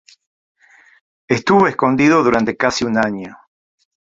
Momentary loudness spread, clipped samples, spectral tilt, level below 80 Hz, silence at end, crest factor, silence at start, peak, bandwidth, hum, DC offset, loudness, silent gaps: 9 LU; under 0.1%; -5.5 dB/octave; -52 dBFS; 0.8 s; 16 dB; 1.3 s; -2 dBFS; 7.8 kHz; none; under 0.1%; -15 LUFS; none